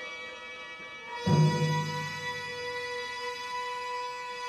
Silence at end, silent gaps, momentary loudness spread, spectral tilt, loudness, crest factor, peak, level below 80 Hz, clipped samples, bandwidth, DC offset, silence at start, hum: 0 s; none; 15 LU; -5.5 dB/octave; -32 LUFS; 20 dB; -14 dBFS; -68 dBFS; under 0.1%; 12.5 kHz; under 0.1%; 0 s; none